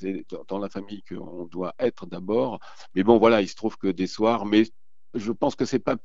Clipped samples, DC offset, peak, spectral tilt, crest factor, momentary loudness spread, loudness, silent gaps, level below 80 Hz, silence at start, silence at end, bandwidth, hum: under 0.1%; 0.9%; -4 dBFS; -6 dB/octave; 22 dB; 17 LU; -24 LUFS; none; -58 dBFS; 0 s; 0.05 s; 7.8 kHz; none